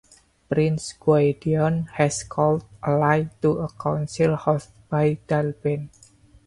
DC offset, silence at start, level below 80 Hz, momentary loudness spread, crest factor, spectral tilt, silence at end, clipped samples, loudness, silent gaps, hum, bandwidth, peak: under 0.1%; 0.5 s; -52 dBFS; 7 LU; 18 dB; -6.5 dB/octave; 0.6 s; under 0.1%; -23 LUFS; none; none; 11.5 kHz; -6 dBFS